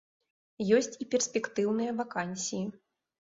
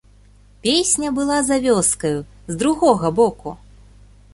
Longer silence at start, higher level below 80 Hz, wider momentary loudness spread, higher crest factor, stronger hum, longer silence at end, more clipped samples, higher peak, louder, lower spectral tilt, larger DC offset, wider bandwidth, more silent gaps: about the same, 0.6 s vs 0.65 s; second, -72 dBFS vs -46 dBFS; about the same, 9 LU vs 11 LU; about the same, 20 dB vs 18 dB; second, none vs 50 Hz at -40 dBFS; about the same, 0.65 s vs 0.75 s; neither; second, -12 dBFS vs -2 dBFS; second, -31 LUFS vs -18 LUFS; about the same, -4 dB/octave vs -3.5 dB/octave; neither; second, 8 kHz vs 11.5 kHz; neither